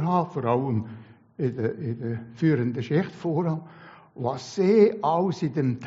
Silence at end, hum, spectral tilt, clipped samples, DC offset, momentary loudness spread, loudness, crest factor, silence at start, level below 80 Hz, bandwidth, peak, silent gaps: 0 s; none; -7.5 dB/octave; under 0.1%; under 0.1%; 12 LU; -25 LUFS; 18 dB; 0 s; -66 dBFS; 7.6 kHz; -6 dBFS; none